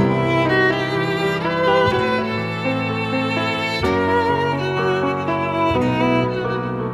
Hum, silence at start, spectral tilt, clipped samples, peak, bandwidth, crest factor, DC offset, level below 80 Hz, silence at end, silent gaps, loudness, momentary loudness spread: none; 0 s; -6.5 dB/octave; under 0.1%; -4 dBFS; 13.5 kHz; 14 dB; under 0.1%; -44 dBFS; 0 s; none; -19 LUFS; 5 LU